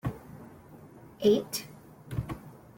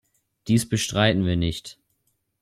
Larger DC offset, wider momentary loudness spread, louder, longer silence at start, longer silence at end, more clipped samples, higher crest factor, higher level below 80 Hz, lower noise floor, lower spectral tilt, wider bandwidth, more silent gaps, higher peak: neither; first, 26 LU vs 18 LU; second, -31 LUFS vs -23 LUFS; second, 0.05 s vs 0.45 s; second, 0.2 s vs 0.7 s; neither; about the same, 20 dB vs 18 dB; second, -54 dBFS vs -46 dBFS; second, -51 dBFS vs -72 dBFS; about the same, -5.5 dB/octave vs -5 dB/octave; about the same, 17 kHz vs 15.5 kHz; neither; second, -12 dBFS vs -6 dBFS